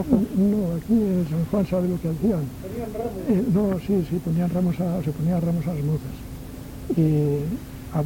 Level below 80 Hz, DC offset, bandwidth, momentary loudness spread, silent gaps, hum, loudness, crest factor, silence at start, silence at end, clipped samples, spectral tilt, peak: -42 dBFS; under 0.1%; 17 kHz; 11 LU; none; none; -24 LUFS; 16 dB; 0 s; 0 s; under 0.1%; -9 dB/octave; -6 dBFS